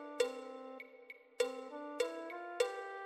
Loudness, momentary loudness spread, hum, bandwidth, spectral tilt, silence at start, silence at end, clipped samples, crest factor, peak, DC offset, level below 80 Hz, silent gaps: -41 LUFS; 14 LU; none; 14 kHz; -1 dB/octave; 0 s; 0 s; under 0.1%; 20 dB; -20 dBFS; under 0.1%; -84 dBFS; none